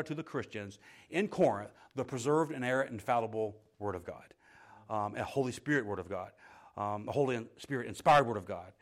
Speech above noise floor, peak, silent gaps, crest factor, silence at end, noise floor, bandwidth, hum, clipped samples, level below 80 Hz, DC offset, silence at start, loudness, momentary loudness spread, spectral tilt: 25 dB; -16 dBFS; none; 18 dB; 0.1 s; -59 dBFS; 15.5 kHz; none; under 0.1%; -70 dBFS; under 0.1%; 0 s; -34 LUFS; 14 LU; -6 dB/octave